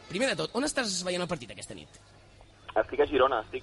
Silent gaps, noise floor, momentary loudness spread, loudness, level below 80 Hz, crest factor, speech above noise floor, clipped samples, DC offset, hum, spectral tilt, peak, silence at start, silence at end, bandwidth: none; -55 dBFS; 18 LU; -29 LUFS; -56 dBFS; 20 dB; 25 dB; under 0.1%; under 0.1%; none; -3.5 dB/octave; -10 dBFS; 0 s; 0 s; 11.5 kHz